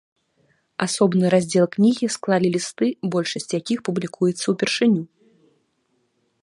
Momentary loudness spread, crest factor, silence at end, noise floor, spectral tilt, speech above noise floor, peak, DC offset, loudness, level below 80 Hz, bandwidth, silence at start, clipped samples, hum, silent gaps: 8 LU; 18 dB; 1.35 s; -69 dBFS; -5 dB/octave; 48 dB; -4 dBFS; under 0.1%; -21 LUFS; -68 dBFS; 11.5 kHz; 0.8 s; under 0.1%; none; none